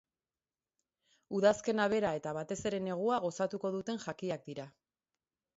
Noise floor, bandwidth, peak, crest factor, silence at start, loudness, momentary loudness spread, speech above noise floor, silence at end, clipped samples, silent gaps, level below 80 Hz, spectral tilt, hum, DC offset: under -90 dBFS; 7.6 kHz; -16 dBFS; 20 dB; 1.3 s; -34 LUFS; 11 LU; over 56 dB; 0.9 s; under 0.1%; none; -70 dBFS; -4.5 dB/octave; none; under 0.1%